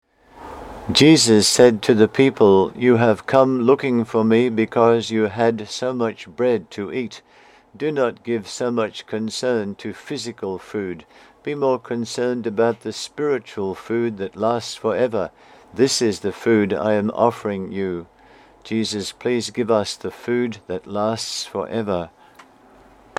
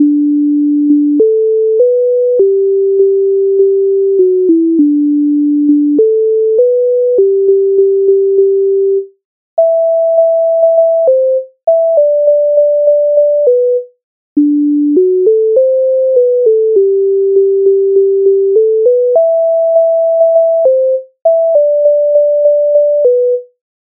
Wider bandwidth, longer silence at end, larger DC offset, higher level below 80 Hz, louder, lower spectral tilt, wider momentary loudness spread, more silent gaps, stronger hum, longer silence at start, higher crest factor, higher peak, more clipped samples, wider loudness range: first, 15.5 kHz vs 1 kHz; first, 1.1 s vs 0.4 s; neither; first, -56 dBFS vs -70 dBFS; second, -20 LUFS vs -10 LUFS; second, -4.5 dB/octave vs -13 dB/octave; first, 14 LU vs 2 LU; second, none vs 9.25-9.57 s, 14.04-14.36 s; neither; first, 0.35 s vs 0 s; first, 20 dB vs 8 dB; about the same, 0 dBFS vs 0 dBFS; neither; first, 10 LU vs 1 LU